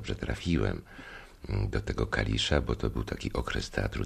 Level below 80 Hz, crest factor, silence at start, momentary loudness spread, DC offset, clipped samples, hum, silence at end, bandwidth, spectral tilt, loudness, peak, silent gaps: -38 dBFS; 20 dB; 0 s; 15 LU; under 0.1%; under 0.1%; none; 0 s; 13.5 kHz; -5.5 dB/octave; -31 LUFS; -10 dBFS; none